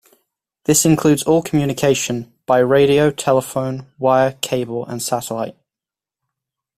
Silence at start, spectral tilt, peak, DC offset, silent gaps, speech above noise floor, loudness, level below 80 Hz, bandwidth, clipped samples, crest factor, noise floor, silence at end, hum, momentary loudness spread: 0.7 s; -4.5 dB/octave; -2 dBFS; under 0.1%; none; 72 dB; -17 LUFS; -50 dBFS; 16 kHz; under 0.1%; 16 dB; -89 dBFS; 1.25 s; none; 12 LU